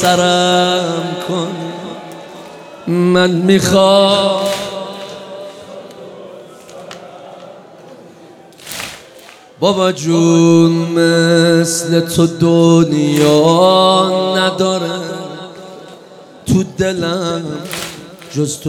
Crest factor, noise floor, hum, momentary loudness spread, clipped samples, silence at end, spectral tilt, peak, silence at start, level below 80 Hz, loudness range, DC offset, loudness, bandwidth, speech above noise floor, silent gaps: 14 dB; -39 dBFS; none; 23 LU; under 0.1%; 0 s; -5 dB/octave; 0 dBFS; 0 s; -52 dBFS; 20 LU; under 0.1%; -13 LUFS; 17 kHz; 27 dB; none